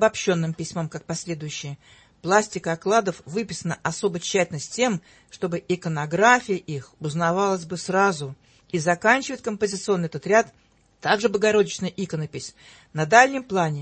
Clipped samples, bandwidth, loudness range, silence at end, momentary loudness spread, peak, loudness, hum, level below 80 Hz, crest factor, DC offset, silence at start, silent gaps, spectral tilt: under 0.1%; 8.8 kHz; 3 LU; 0 s; 14 LU; 0 dBFS; -23 LUFS; none; -62 dBFS; 22 dB; under 0.1%; 0 s; none; -4.5 dB/octave